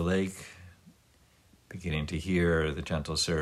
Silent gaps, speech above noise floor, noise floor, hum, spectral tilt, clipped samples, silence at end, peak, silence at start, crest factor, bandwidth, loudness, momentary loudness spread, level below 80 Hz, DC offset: none; 34 dB; -63 dBFS; none; -5 dB/octave; under 0.1%; 0 s; -18 dBFS; 0 s; 14 dB; 13.5 kHz; -31 LUFS; 20 LU; -46 dBFS; under 0.1%